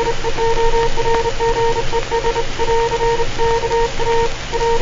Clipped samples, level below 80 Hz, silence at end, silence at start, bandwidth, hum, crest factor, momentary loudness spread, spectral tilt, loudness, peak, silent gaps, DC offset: under 0.1%; -22 dBFS; 0 s; 0 s; 7.6 kHz; none; 12 dB; 3 LU; -4 dB/octave; -18 LUFS; -2 dBFS; none; under 0.1%